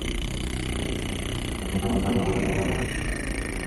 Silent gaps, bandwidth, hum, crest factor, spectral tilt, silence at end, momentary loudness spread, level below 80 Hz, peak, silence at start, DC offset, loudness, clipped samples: none; 13.5 kHz; none; 16 dB; -5 dB/octave; 0 s; 6 LU; -34 dBFS; -12 dBFS; 0 s; under 0.1%; -28 LUFS; under 0.1%